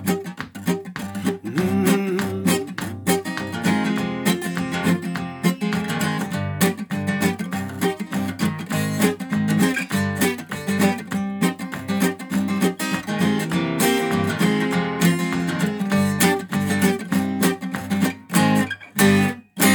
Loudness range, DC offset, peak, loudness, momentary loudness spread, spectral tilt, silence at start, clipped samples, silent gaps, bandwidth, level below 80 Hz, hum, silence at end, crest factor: 3 LU; under 0.1%; -4 dBFS; -22 LUFS; 7 LU; -5 dB/octave; 0 s; under 0.1%; none; 19.5 kHz; -58 dBFS; none; 0 s; 18 dB